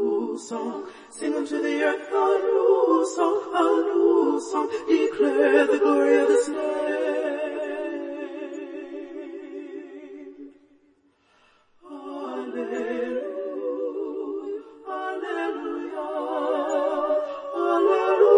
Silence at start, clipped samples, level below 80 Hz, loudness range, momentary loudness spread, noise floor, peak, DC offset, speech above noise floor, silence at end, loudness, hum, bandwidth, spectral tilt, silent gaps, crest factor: 0 s; under 0.1%; -76 dBFS; 17 LU; 18 LU; -63 dBFS; -4 dBFS; under 0.1%; 41 dB; 0 s; -24 LUFS; none; 10.5 kHz; -3.5 dB/octave; none; 20 dB